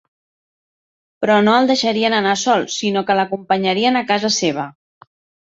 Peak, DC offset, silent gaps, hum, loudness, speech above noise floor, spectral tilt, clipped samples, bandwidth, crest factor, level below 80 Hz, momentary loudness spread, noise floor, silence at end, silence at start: -2 dBFS; under 0.1%; none; none; -16 LUFS; over 74 dB; -3.5 dB/octave; under 0.1%; 8 kHz; 16 dB; -62 dBFS; 7 LU; under -90 dBFS; 0.7 s; 1.2 s